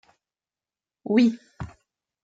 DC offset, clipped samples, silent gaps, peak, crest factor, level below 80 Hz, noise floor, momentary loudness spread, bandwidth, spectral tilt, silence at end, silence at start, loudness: under 0.1%; under 0.1%; none; -8 dBFS; 20 dB; -58 dBFS; under -90 dBFS; 20 LU; 7.6 kHz; -7 dB/octave; 0.55 s; 1.05 s; -22 LUFS